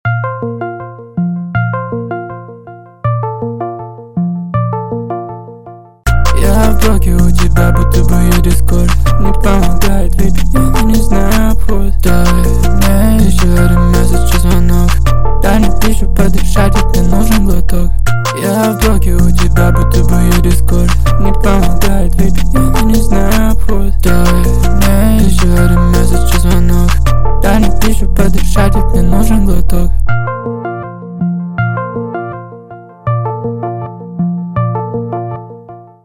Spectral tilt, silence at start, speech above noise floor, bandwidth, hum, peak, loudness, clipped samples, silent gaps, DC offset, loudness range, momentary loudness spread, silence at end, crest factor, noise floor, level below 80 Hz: -6 dB/octave; 0.05 s; 25 dB; 17 kHz; none; 0 dBFS; -12 LUFS; under 0.1%; none; under 0.1%; 8 LU; 11 LU; 0 s; 10 dB; -33 dBFS; -14 dBFS